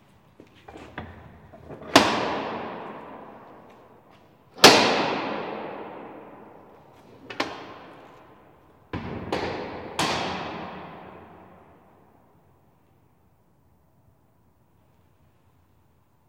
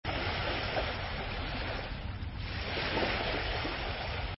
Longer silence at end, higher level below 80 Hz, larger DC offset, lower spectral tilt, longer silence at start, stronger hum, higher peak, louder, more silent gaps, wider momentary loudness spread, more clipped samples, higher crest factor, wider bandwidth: first, 4.95 s vs 0 s; second, -62 dBFS vs -42 dBFS; neither; about the same, -2.5 dB/octave vs -3 dB/octave; first, 0.7 s vs 0.05 s; neither; first, 0 dBFS vs -18 dBFS; first, -23 LUFS vs -35 LUFS; neither; first, 27 LU vs 7 LU; neither; first, 30 dB vs 18 dB; first, 16.5 kHz vs 5.8 kHz